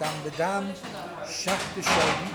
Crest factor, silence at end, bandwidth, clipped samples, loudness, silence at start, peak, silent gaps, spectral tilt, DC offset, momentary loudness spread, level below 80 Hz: 18 dB; 0 s; over 20 kHz; under 0.1%; -27 LUFS; 0 s; -10 dBFS; none; -3 dB/octave; under 0.1%; 14 LU; -54 dBFS